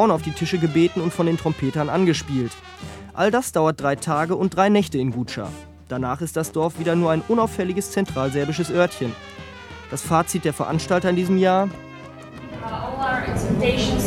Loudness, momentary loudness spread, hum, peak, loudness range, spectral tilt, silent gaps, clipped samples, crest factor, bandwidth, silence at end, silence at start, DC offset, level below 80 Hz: -22 LUFS; 17 LU; none; -2 dBFS; 2 LU; -5.5 dB/octave; none; under 0.1%; 20 dB; 16.5 kHz; 0 s; 0 s; under 0.1%; -44 dBFS